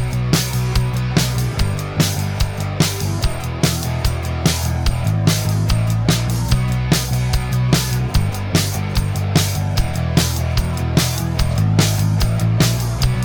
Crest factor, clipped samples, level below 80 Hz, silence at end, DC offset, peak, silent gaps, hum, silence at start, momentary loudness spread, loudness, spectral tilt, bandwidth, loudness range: 16 dB; under 0.1%; -26 dBFS; 0 s; under 0.1%; -2 dBFS; none; none; 0 s; 4 LU; -18 LUFS; -5 dB/octave; 19.5 kHz; 2 LU